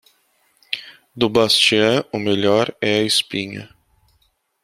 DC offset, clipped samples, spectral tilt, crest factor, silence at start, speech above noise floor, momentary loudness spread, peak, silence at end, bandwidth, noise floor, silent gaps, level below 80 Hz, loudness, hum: under 0.1%; under 0.1%; -3.5 dB/octave; 18 dB; 0.7 s; 46 dB; 15 LU; -2 dBFS; 1 s; 15 kHz; -64 dBFS; none; -58 dBFS; -17 LUFS; none